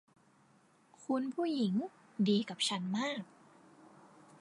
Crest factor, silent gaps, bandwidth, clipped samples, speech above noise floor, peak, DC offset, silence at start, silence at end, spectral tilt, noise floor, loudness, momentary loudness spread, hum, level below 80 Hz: 18 dB; none; 11.5 kHz; under 0.1%; 33 dB; -20 dBFS; under 0.1%; 1 s; 1.15 s; -5 dB/octave; -67 dBFS; -35 LUFS; 13 LU; none; -86 dBFS